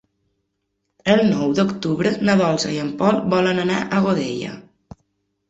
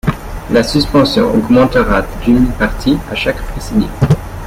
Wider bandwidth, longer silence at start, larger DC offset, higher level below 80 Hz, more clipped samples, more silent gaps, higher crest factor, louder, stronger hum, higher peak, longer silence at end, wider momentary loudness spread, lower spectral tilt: second, 8 kHz vs 16 kHz; first, 1.05 s vs 0.05 s; neither; second, -56 dBFS vs -24 dBFS; neither; neither; first, 18 dB vs 12 dB; second, -19 LUFS vs -13 LUFS; neither; second, -4 dBFS vs 0 dBFS; first, 0.9 s vs 0 s; about the same, 8 LU vs 7 LU; about the same, -6 dB/octave vs -6.5 dB/octave